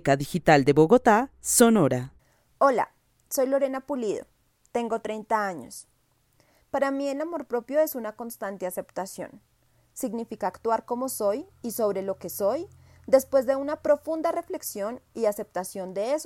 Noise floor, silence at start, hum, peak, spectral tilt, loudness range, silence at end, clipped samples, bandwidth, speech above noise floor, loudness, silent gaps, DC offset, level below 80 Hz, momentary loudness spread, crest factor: -66 dBFS; 0.05 s; none; -4 dBFS; -5 dB/octave; 9 LU; 0 s; under 0.1%; 16 kHz; 41 dB; -26 LUFS; none; under 0.1%; -60 dBFS; 15 LU; 22 dB